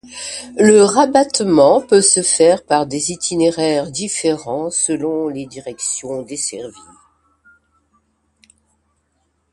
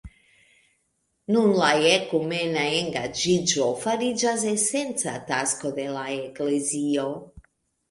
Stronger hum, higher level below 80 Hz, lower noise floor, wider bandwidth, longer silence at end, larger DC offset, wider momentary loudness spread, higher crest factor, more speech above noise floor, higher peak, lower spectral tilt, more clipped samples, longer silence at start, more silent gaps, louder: neither; about the same, -56 dBFS vs -58 dBFS; second, -66 dBFS vs -73 dBFS; about the same, 11.5 kHz vs 11.5 kHz; first, 2.85 s vs 0.5 s; neither; first, 15 LU vs 10 LU; about the same, 16 dB vs 18 dB; about the same, 50 dB vs 49 dB; first, 0 dBFS vs -6 dBFS; about the same, -3.5 dB/octave vs -3 dB/octave; neither; about the same, 0.05 s vs 0.05 s; neither; first, -15 LUFS vs -24 LUFS